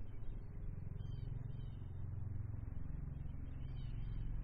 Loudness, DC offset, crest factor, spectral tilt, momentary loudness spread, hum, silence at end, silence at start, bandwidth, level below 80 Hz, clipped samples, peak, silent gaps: -49 LUFS; under 0.1%; 12 dB; -9 dB/octave; 4 LU; none; 0 s; 0 s; 4.8 kHz; -48 dBFS; under 0.1%; -32 dBFS; none